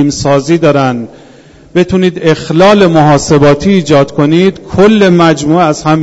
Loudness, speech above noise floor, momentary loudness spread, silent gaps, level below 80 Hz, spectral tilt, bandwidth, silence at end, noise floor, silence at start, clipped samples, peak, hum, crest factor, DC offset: -8 LUFS; 30 dB; 6 LU; none; -36 dBFS; -6 dB/octave; 8.2 kHz; 0 s; -37 dBFS; 0 s; 2%; 0 dBFS; none; 8 dB; under 0.1%